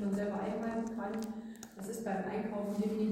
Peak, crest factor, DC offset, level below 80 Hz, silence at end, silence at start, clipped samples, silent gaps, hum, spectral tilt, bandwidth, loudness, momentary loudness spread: -24 dBFS; 14 dB; under 0.1%; -66 dBFS; 0 s; 0 s; under 0.1%; none; none; -6.5 dB/octave; 16.5 kHz; -38 LUFS; 9 LU